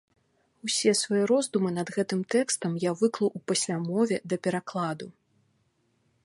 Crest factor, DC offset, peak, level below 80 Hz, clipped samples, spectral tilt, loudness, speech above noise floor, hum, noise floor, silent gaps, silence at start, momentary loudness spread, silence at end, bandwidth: 18 dB; under 0.1%; -10 dBFS; -76 dBFS; under 0.1%; -4 dB/octave; -27 LUFS; 44 dB; none; -71 dBFS; none; 0.65 s; 8 LU; 1.15 s; 11.5 kHz